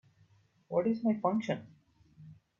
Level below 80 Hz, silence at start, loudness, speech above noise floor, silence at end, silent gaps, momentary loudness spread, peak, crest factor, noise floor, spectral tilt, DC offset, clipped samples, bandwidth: -76 dBFS; 0.7 s; -33 LUFS; 35 dB; 0.25 s; none; 7 LU; -16 dBFS; 18 dB; -67 dBFS; -8 dB/octave; under 0.1%; under 0.1%; 7.2 kHz